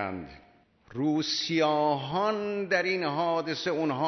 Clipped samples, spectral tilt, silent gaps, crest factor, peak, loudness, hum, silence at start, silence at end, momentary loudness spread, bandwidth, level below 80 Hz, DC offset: under 0.1%; -5 dB/octave; none; 18 dB; -12 dBFS; -28 LUFS; none; 0 s; 0 s; 9 LU; 6.4 kHz; -66 dBFS; under 0.1%